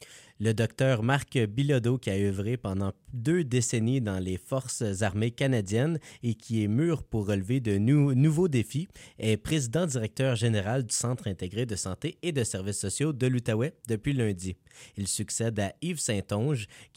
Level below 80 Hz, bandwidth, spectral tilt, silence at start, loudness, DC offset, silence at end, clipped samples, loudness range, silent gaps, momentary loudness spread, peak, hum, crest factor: -56 dBFS; 16 kHz; -5.5 dB/octave; 0 s; -29 LUFS; under 0.1%; 0.1 s; under 0.1%; 3 LU; none; 7 LU; -12 dBFS; none; 16 dB